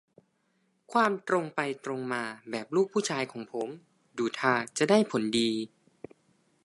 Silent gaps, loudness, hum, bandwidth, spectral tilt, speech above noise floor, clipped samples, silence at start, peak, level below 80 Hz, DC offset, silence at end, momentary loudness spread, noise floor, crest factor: none; -29 LUFS; none; 11.5 kHz; -4.5 dB/octave; 44 dB; under 0.1%; 0.9 s; -10 dBFS; -76 dBFS; under 0.1%; 1 s; 12 LU; -73 dBFS; 20 dB